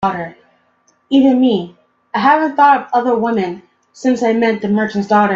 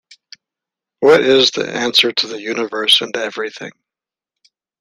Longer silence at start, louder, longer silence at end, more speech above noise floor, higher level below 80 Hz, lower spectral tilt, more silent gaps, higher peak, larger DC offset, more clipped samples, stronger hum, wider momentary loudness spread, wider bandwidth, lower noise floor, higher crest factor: second, 0 s vs 1 s; about the same, -14 LUFS vs -14 LUFS; second, 0 s vs 1.1 s; second, 44 dB vs 73 dB; about the same, -58 dBFS vs -62 dBFS; first, -6.5 dB/octave vs -2.5 dB/octave; neither; about the same, 0 dBFS vs 0 dBFS; neither; neither; neither; about the same, 13 LU vs 14 LU; second, 7.6 kHz vs 15.5 kHz; second, -58 dBFS vs -89 dBFS; about the same, 14 dB vs 18 dB